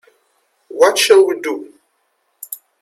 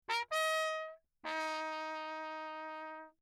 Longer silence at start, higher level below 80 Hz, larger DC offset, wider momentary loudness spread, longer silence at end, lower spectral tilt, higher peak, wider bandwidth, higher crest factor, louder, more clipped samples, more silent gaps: first, 0.7 s vs 0.1 s; first, -66 dBFS vs -86 dBFS; neither; first, 21 LU vs 13 LU; first, 0.25 s vs 0.1 s; about the same, -0.5 dB/octave vs 0.5 dB/octave; first, 0 dBFS vs -22 dBFS; about the same, 16 kHz vs 17.5 kHz; about the same, 18 dB vs 18 dB; first, -13 LUFS vs -39 LUFS; neither; neither